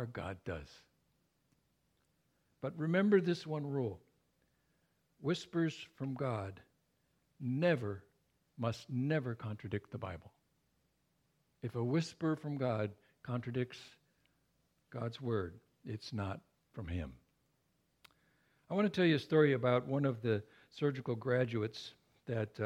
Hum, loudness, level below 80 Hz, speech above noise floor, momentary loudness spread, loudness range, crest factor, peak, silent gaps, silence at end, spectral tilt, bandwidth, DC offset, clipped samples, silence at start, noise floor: none; -37 LUFS; -66 dBFS; 42 dB; 17 LU; 10 LU; 22 dB; -16 dBFS; none; 0 s; -7.5 dB/octave; 11.5 kHz; under 0.1%; under 0.1%; 0 s; -79 dBFS